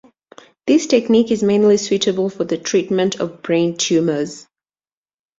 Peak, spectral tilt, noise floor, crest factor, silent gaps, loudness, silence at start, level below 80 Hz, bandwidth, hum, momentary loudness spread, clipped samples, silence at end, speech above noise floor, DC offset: -2 dBFS; -4.5 dB/octave; under -90 dBFS; 16 dB; none; -17 LUFS; 0.65 s; -60 dBFS; 7.8 kHz; none; 9 LU; under 0.1%; 1 s; over 74 dB; under 0.1%